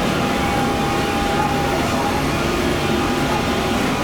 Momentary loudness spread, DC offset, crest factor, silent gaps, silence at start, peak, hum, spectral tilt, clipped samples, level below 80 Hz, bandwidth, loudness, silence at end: 1 LU; 0.2%; 12 dB; none; 0 s; -6 dBFS; none; -5 dB/octave; under 0.1%; -34 dBFS; over 20 kHz; -19 LUFS; 0 s